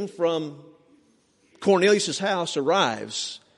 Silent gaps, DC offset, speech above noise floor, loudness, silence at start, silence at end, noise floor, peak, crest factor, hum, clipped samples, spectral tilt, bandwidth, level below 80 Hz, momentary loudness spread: none; under 0.1%; 39 dB; -23 LUFS; 0 s; 0.2 s; -63 dBFS; -6 dBFS; 18 dB; none; under 0.1%; -3.5 dB/octave; 11.5 kHz; -72 dBFS; 11 LU